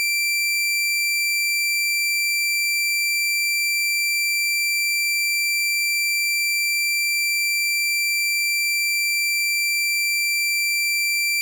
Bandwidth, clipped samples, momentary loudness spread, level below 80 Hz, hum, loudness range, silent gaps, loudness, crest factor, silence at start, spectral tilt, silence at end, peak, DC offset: 17 kHz; under 0.1%; 0 LU; under -90 dBFS; none; 0 LU; none; -19 LUFS; 6 dB; 0 s; 14.5 dB/octave; 0 s; -16 dBFS; under 0.1%